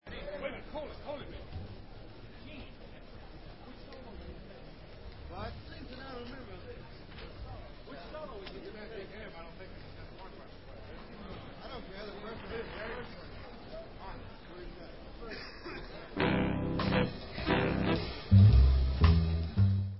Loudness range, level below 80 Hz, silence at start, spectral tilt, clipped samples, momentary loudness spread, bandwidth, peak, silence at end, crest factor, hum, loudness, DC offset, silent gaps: 20 LU; -38 dBFS; 0 s; -10.5 dB/octave; under 0.1%; 22 LU; 5.8 kHz; -12 dBFS; 0 s; 22 dB; none; -32 LUFS; 0.2%; none